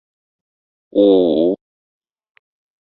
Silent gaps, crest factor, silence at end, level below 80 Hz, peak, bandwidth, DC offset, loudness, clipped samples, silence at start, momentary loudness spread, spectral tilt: none; 16 dB; 1.3 s; -60 dBFS; -2 dBFS; 4.3 kHz; under 0.1%; -15 LUFS; under 0.1%; 0.95 s; 10 LU; -10.5 dB/octave